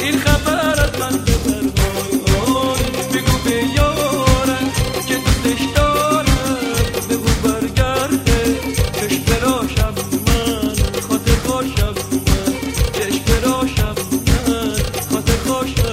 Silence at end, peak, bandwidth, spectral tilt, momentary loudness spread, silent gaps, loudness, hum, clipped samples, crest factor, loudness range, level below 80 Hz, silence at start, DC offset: 0 s; 0 dBFS; 16.5 kHz; -4.5 dB/octave; 4 LU; none; -17 LUFS; none; under 0.1%; 16 dB; 2 LU; -24 dBFS; 0 s; under 0.1%